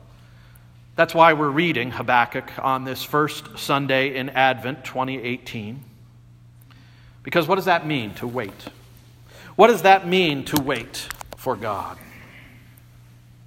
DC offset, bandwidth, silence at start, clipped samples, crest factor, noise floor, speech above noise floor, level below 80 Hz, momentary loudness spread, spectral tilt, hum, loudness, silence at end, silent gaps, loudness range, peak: under 0.1%; 16.5 kHz; 0.95 s; under 0.1%; 22 dB; -48 dBFS; 27 dB; -56 dBFS; 17 LU; -5 dB/octave; none; -21 LUFS; 1 s; none; 6 LU; 0 dBFS